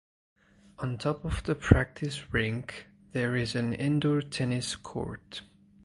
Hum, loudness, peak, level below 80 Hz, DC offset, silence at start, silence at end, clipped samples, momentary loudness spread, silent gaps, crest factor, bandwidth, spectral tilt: none; -30 LUFS; -4 dBFS; -42 dBFS; under 0.1%; 0.8 s; 0.4 s; under 0.1%; 14 LU; none; 26 dB; 11.5 kHz; -6 dB/octave